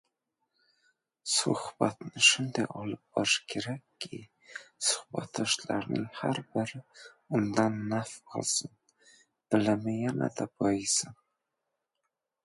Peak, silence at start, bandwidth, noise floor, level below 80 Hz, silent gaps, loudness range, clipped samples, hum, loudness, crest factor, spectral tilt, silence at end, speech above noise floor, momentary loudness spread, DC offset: -8 dBFS; 1.25 s; 11.5 kHz; -85 dBFS; -70 dBFS; none; 5 LU; under 0.1%; none; -30 LUFS; 24 dB; -3 dB/octave; 1.3 s; 54 dB; 15 LU; under 0.1%